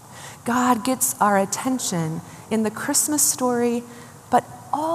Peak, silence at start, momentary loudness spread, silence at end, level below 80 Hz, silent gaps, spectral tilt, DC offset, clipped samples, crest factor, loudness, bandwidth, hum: -4 dBFS; 0.05 s; 13 LU; 0 s; -66 dBFS; none; -3.5 dB/octave; under 0.1%; under 0.1%; 18 dB; -21 LUFS; 15 kHz; none